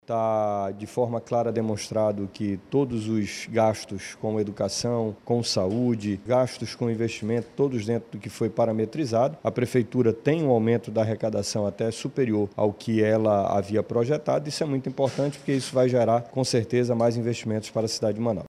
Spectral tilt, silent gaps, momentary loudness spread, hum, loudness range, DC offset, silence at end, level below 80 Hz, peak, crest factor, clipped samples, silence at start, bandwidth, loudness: -6 dB/octave; none; 6 LU; none; 2 LU; under 0.1%; 0 s; -62 dBFS; -8 dBFS; 18 dB; under 0.1%; 0.1 s; 14 kHz; -26 LUFS